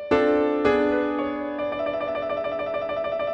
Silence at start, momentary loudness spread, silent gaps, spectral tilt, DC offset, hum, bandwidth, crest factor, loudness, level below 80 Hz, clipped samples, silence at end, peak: 0 s; 7 LU; none; -6.5 dB/octave; under 0.1%; none; 7.8 kHz; 16 dB; -24 LUFS; -52 dBFS; under 0.1%; 0 s; -8 dBFS